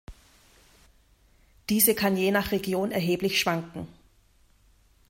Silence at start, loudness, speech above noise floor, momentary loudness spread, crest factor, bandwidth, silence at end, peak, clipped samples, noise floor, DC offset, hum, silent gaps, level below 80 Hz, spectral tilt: 0.1 s; -25 LUFS; 36 dB; 19 LU; 24 dB; 16.5 kHz; 1.2 s; -6 dBFS; under 0.1%; -61 dBFS; under 0.1%; none; none; -56 dBFS; -4 dB/octave